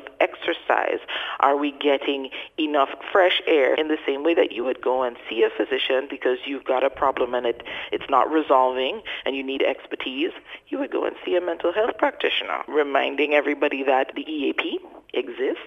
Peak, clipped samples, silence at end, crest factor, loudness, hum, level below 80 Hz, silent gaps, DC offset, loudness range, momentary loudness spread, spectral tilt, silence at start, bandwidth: -2 dBFS; under 0.1%; 0 s; 22 dB; -23 LUFS; none; -62 dBFS; none; under 0.1%; 3 LU; 9 LU; -4.5 dB/octave; 0 s; 7.2 kHz